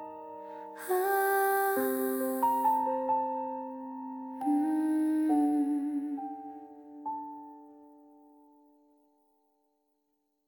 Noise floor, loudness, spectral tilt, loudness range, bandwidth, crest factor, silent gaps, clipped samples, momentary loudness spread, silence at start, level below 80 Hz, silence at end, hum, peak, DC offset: -78 dBFS; -30 LUFS; -4 dB/octave; 17 LU; 18 kHz; 16 dB; none; under 0.1%; 17 LU; 0 s; -82 dBFS; 2.6 s; none; -16 dBFS; under 0.1%